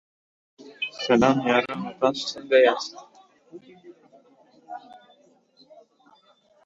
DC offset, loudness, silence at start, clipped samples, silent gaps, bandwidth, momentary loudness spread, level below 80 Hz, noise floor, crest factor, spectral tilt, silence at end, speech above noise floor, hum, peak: under 0.1%; -23 LUFS; 0.6 s; under 0.1%; none; 7.8 kHz; 23 LU; -62 dBFS; -60 dBFS; 22 dB; -5 dB/octave; 1.9 s; 38 dB; none; -4 dBFS